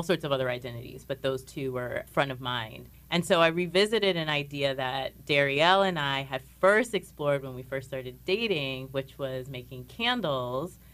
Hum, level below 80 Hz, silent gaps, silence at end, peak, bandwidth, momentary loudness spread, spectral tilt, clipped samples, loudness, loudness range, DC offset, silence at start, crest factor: none; -56 dBFS; none; 0.2 s; -8 dBFS; 15.5 kHz; 14 LU; -5 dB/octave; under 0.1%; -28 LUFS; 6 LU; under 0.1%; 0 s; 22 dB